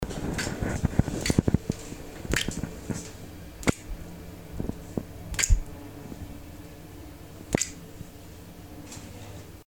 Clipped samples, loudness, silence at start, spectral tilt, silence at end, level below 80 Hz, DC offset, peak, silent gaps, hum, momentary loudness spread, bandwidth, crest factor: under 0.1%; -30 LUFS; 0 s; -4.5 dB/octave; 0.1 s; -36 dBFS; 0.2%; -4 dBFS; none; none; 19 LU; over 20 kHz; 26 dB